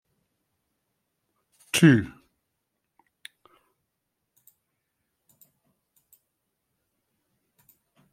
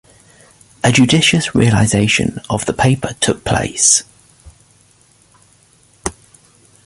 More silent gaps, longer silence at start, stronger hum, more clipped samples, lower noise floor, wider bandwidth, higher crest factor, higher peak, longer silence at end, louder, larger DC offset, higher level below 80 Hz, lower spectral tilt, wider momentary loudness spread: neither; first, 1.75 s vs 0.85 s; neither; neither; first, -81 dBFS vs -51 dBFS; first, 16 kHz vs 11.5 kHz; first, 26 dB vs 16 dB; second, -4 dBFS vs 0 dBFS; first, 6.05 s vs 0.75 s; second, -20 LUFS vs -13 LUFS; neither; second, -66 dBFS vs -40 dBFS; first, -5.5 dB/octave vs -3.5 dB/octave; first, 30 LU vs 11 LU